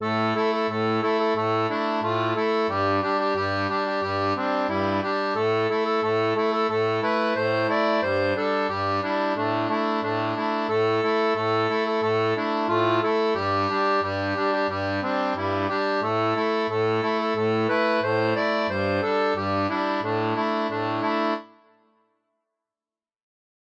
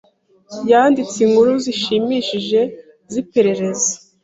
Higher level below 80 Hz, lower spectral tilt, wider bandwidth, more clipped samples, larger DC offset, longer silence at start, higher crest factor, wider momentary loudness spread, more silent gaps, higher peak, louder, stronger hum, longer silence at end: second, -70 dBFS vs -60 dBFS; first, -6.5 dB/octave vs -3.5 dB/octave; about the same, 8 kHz vs 8 kHz; neither; neither; second, 0 s vs 0.5 s; about the same, 14 dB vs 16 dB; second, 3 LU vs 12 LU; neither; second, -10 dBFS vs -2 dBFS; second, -24 LUFS vs -16 LUFS; neither; first, 2.3 s vs 0.25 s